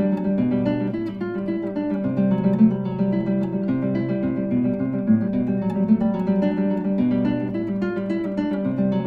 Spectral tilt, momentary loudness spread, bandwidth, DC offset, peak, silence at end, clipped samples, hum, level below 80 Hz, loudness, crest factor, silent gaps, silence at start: -10.5 dB/octave; 6 LU; 4.7 kHz; under 0.1%; -4 dBFS; 0 s; under 0.1%; none; -52 dBFS; -22 LUFS; 16 dB; none; 0 s